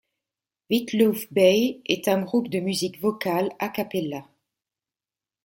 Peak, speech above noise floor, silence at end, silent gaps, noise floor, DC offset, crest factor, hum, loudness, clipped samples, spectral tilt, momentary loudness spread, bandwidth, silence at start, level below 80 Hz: -4 dBFS; over 67 dB; 1.2 s; none; under -90 dBFS; under 0.1%; 20 dB; none; -24 LUFS; under 0.1%; -5 dB/octave; 10 LU; 17 kHz; 0.7 s; -68 dBFS